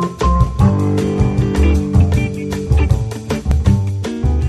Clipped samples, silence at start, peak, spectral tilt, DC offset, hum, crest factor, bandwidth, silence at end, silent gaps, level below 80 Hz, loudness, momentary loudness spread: under 0.1%; 0 s; 0 dBFS; -7.5 dB/octave; under 0.1%; none; 14 dB; 12.5 kHz; 0 s; none; -20 dBFS; -16 LUFS; 7 LU